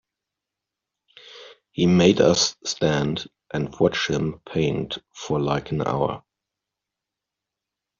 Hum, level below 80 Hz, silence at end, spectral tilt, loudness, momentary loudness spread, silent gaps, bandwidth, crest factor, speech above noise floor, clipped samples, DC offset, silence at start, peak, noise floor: none; -54 dBFS; 1.8 s; -5 dB/octave; -22 LUFS; 15 LU; none; 7.4 kHz; 22 dB; 64 dB; under 0.1%; under 0.1%; 1.25 s; -4 dBFS; -86 dBFS